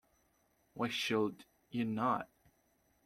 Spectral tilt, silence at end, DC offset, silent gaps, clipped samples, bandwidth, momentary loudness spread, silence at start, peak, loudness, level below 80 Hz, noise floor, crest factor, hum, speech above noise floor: -5 dB/octave; 0.8 s; under 0.1%; none; under 0.1%; 15 kHz; 12 LU; 0.75 s; -20 dBFS; -37 LUFS; -76 dBFS; -75 dBFS; 18 dB; none; 39 dB